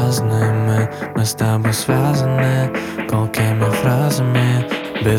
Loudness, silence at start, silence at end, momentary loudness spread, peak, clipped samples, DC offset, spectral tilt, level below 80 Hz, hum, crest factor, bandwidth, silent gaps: -17 LUFS; 0 s; 0 s; 5 LU; -2 dBFS; under 0.1%; under 0.1%; -6 dB/octave; -46 dBFS; none; 14 dB; 16.5 kHz; none